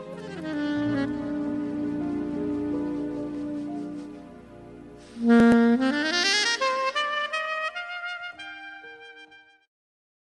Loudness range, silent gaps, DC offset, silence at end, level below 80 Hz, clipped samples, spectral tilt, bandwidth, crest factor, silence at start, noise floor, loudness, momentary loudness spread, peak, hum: 9 LU; none; under 0.1%; 0.85 s; -58 dBFS; under 0.1%; -4 dB/octave; 11.5 kHz; 20 dB; 0 s; -51 dBFS; -25 LUFS; 24 LU; -8 dBFS; none